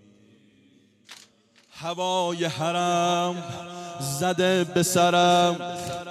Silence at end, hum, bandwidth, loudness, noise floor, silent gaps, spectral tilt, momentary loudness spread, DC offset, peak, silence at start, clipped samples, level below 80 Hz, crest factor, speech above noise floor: 0 s; none; 15.5 kHz; -23 LUFS; -59 dBFS; none; -4 dB/octave; 15 LU; under 0.1%; -8 dBFS; 1.1 s; under 0.1%; -68 dBFS; 18 dB; 35 dB